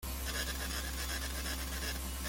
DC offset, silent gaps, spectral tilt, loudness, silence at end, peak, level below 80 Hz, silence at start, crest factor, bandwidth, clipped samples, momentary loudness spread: under 0.1%; none; -2.5 dB/octave; -38 LUFS; 0 s; -24 dBFS; -42 dBFS; 0 s; 16 dB; 17 kHz; under 0.1%; 1 LU